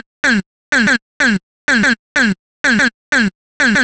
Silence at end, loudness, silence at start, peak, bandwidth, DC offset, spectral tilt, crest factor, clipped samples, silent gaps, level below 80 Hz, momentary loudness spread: 0 s; -15 LUFS; 0.25 s; 0 dBFS; 10 kHz; under 0.1%; -3.5 dB/octave; 14 dB; under 0.1%; 0.46-0.72 s, 1.02-1.20 s, 1.43-1.68 s, 1.99-2.15 s, 2.39-2.64 s, 2.94-3.12 s, 3.35-3.60 s; -46 dBFS; 5 LU